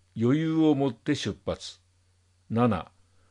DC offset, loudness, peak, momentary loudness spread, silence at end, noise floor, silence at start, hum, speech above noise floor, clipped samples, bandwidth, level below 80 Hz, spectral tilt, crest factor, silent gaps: under 0.1%; -27 LUFS; -12 dBFS; 13 LU; 0.45 s; -65 dBFS; 0.15 s; none; 40 dB; under 0.1%; 10.5 kHz; -60 dBFS; -7 dB/octave; 16 dB; none